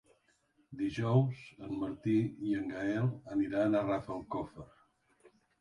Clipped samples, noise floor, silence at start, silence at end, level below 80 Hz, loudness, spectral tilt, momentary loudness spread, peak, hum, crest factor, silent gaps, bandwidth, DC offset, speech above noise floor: under 0.1%; -72 dBFS; 0.7 s; 0.95 s; -64 dBFS; -34 LUFS; -8.5 dB/octave; 12 LU; -16 dBFS; none; 18 dB; none; 10.5 kHz; under 0.1%; 39 dB